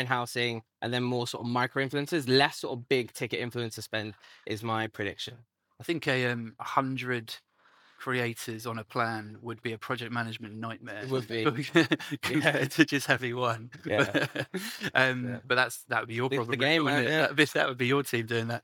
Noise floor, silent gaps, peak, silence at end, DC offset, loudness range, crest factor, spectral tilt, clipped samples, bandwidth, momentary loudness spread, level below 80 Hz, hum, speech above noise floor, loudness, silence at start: -62 dBFS; none; -6 dBFS; 0.05 s; under 0.1%; 7 LU; 24 dB; -5 dB/octave; under 0.1%; 19 kHz; 12 LU; -78 dBFS; none; 33 dB; -29 LUFS; 0 s